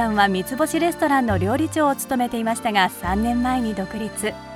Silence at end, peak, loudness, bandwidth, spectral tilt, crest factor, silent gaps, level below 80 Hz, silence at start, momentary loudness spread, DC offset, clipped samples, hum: 0 s; -4 dBFS; -21 LUFS; 17 kHz; -4.5 dB/octave; 18 dB; none; -42 dBFS; 0 s; 7 LU; under 0.1%; under 0.1%; none